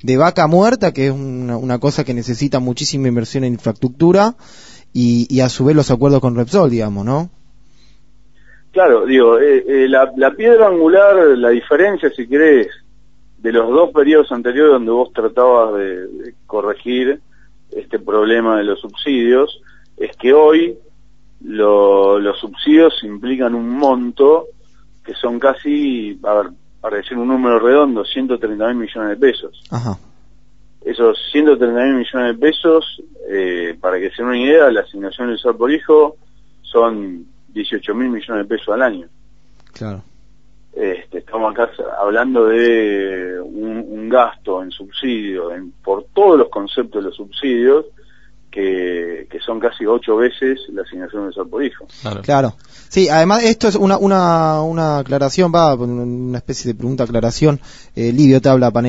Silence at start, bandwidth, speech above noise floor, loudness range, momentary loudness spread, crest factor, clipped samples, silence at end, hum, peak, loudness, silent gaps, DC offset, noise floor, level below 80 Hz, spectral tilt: 0 s; 8 kHz; 37 dB; 7 LU; 15 LU; 14 dB; under 0.1%; 0 s; none; 0 dBFS; -14 LUFS; none; 0.8%; -51 dBFS; -46 dBFS; -6.5 dB/octave